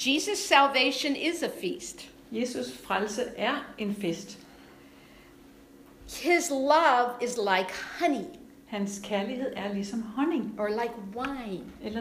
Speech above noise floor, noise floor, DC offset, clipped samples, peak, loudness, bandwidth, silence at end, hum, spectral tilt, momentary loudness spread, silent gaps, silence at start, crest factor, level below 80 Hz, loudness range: 25 dB; -53 dBFS; under 0.1%; under 0.1%; -6 dBFS; -28 LUFS; 15.5 kHz; 0 s; none; -3 dB/octave; 16 LU; none; 0 s; 22 dB; -62 dBFS; 6 LU